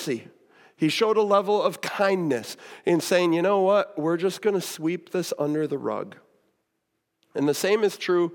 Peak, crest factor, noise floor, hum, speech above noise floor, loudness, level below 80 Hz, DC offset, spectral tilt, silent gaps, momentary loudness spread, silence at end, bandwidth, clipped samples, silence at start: -8 dBFS; 16 dB; -78 dBFS; none; 54 dB; -24 LUFS; -84 dBFS; under 0.1%; -5 dB/octave; none; 10 LU; 0 s; 18 kHz; under 0.1%; 0 s